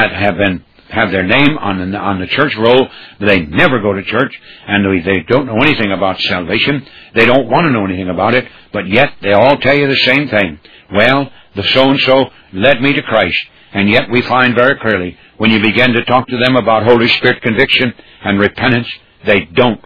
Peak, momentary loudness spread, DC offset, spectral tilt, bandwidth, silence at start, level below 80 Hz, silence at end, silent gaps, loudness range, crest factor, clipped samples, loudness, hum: 0 dBFS; 8 LU; 1%; -7.5 dB/octave; 5.4 kHz; 0 s; -42 dBFS; 0.1 s; none; 2 LU; 12 dB; 0.3%; -11 LUFS; none